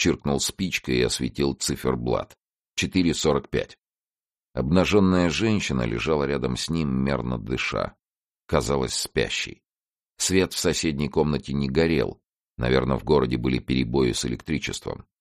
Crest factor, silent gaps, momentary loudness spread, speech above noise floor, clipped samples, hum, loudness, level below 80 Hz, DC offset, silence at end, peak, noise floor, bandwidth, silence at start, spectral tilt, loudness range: 18 dB; 2.46-2.57 s, 4.03-4.11 s, 8.10-8.34 s, 9.73-9.77 s, 9.88-9.93 s, 10.10-10.14 s, 12.36-12.40 s; 8 LU; over 66 dB; under 0.1%; none; -24 LUFS; -42 dBFS; under 0.1%; 0.25 s; -6 dBFS; under -90 dBFS; 14.5 kHz; 0 s; -5 dB/octave; 3 LU